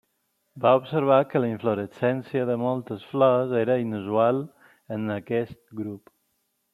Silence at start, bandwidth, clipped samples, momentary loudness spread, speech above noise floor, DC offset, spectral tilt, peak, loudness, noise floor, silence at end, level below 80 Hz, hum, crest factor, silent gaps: 0.55 s; 13 kHz; under 0.1%; 15 LU; 50 dB; under 0.1%; -9 dB/octave; -6 dBFS; -24 LUFS; -74 dBFS; 0.75 s; -70 dBFS; none; 20 dB; none